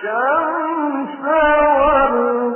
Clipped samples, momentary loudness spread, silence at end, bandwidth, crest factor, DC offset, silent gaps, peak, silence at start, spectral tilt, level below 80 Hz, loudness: under 0.1%; 8 LU; 0 s; 3.2 kHz; 14 dB; under 0.1%; none; -2 dBFS; 0 s; -10 dB/octave; -40 dBFS; -16 LUFS